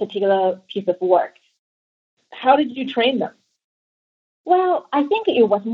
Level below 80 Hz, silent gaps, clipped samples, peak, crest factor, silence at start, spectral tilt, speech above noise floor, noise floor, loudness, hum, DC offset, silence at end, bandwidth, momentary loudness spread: -78 dBFS; 1.59-2.17 s, 3.64-4.44 s; under 0.1%; -2 dBFS; 18 dB; 0 s; -7 dB/octave; over 72 dB; under -90 dBFS; -19 LUFS; none; under 0.1%; 0 s; 5.6 kHz; 9 LU